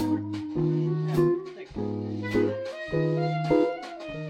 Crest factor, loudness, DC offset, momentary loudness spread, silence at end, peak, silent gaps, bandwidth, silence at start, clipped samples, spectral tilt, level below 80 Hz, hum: 16 dB; -28 LUFS; under 0.1%; 9 LU; 0 s; -10 dBFS; none; 13.5 kHz; 0 s; under 0.1%; -8.5 dB/octave; -54 dBFS; none